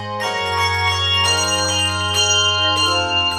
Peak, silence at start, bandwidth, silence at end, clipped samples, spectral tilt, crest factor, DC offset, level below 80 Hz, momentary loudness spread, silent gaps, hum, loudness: -4 dBFS; 0 s; 17 kHz; 0 s; under 0.1%; -1.5 dB/octave; 14 dB; under 0.1%; -46 dBFS; 5 LU; none; none; -16 LUFS